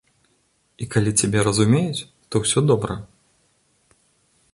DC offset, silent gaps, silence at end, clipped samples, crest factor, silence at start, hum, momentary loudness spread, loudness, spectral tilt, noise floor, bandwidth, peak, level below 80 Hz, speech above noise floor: under 0.1%; none; 1.5 s; under 0.1%; 20 dB; 0.8 s; none; 12 LU; -20 LUFS; -5 dB/octave; -65 dBFS; 11.5 kHz; -4 dBFS; -48 dBFS; 45 dB